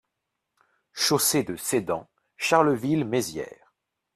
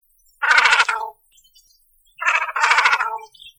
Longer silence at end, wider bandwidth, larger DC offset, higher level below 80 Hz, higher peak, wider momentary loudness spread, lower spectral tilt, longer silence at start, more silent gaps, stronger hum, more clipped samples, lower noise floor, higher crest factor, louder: first, 0.65 s vs 0.1 s; second, 15.5 kHz vs 19.5 kHz; neither; about the same, -64 dBFS vs -64 dBFS; second, -4 dBFS vs 0 dBFS; about the same, 13 LU vs 14 LU; first, -3.5 dB/octave vs 2.5 dB/octave; first, 0.95 s vs 0.4 s; neither; neither; neither; first, -82 dBFS vs -58 dBFS; about the same, 22 dB vs 20 dB; second, -24 LUFS vs -17 LUFS